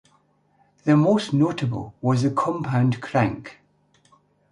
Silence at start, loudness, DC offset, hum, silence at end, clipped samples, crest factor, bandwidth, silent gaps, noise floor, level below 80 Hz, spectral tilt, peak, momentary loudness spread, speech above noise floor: 0.85 s; -22 LUFS; under 0.1%; 50 Hz at -50 dBFS; 1 s; under 0.1%; 18 dB; 11 kHz; none; -63 dBFS; -56 dBFS; -7.5 dB/octave; -6 dBFS; 10 LU; 42 dB